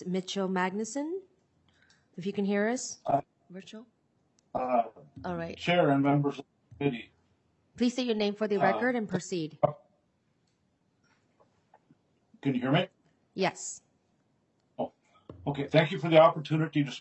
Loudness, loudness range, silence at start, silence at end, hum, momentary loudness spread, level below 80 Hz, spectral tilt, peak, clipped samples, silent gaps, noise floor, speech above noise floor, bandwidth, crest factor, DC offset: -29 LUFS; 7 LU; 0 s; 0 s; none; 17 LU; -72 dBFS; -5.5 dB/octave; -8 dBFS; under 0.1%; none; -73 dBFS; 44 dB; 8.4 kHz; 24 dB; under 0.1%